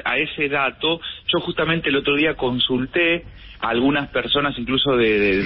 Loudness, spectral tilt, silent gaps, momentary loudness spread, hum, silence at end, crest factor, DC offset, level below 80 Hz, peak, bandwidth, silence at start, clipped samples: -20 LUFS; -10 dB/octave; none; 5 LU; none; 0 s; 12 dB; 0.1%; -44 dBFS; -8 dBFS; 5.8 kHz; 0.05 s; under 0.1%